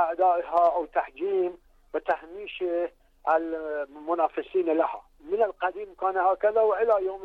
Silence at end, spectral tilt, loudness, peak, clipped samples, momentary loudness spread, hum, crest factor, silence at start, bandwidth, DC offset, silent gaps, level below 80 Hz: 0 s; -6 dB/octave; -27 LUFS; -12 dBFS; under 0.1%; 10 LU; none; 14 dB; 0 s; 5 kHz; under 0.1%; none; -60 dBFS